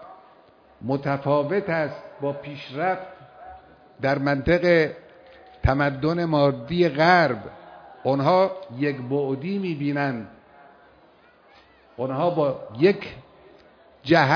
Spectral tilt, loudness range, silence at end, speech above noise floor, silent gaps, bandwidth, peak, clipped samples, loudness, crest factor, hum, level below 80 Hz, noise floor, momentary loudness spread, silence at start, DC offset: -7.5 dB/octave; 7 LU; 0 s; 33 dB; none; 5.4 kHz; -4 dBFS; under 0.1%; -23 LUFS; 20 dB; none; -44 dBFS; -55 dBFS; 18 LU; 0 s; under 0.1%